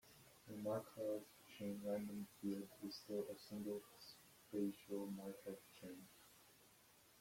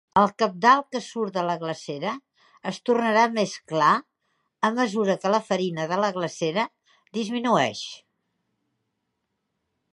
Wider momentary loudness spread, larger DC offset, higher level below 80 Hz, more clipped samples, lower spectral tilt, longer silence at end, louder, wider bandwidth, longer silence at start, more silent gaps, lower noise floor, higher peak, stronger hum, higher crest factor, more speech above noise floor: first, 19 LU vs 11 LU; neither; second, -84 dBFS vs -70 dBFS; neither; about the same, -6 dB/octave vs -5 dB/octave; second, 0 s vs 1.95 s; second, -50 LUFS vs -24 LUFS; first, 16.5 kHz vs 11.5 kHz; about the same, 0.05 s vs 0.15 s; neither; second, -71 dBFS vs -78 dBFS; second, -32 dBFS vs -4 dBFS; neither; about the same, 18 dB vs 20 dB; second, 22 dB vs 55 dB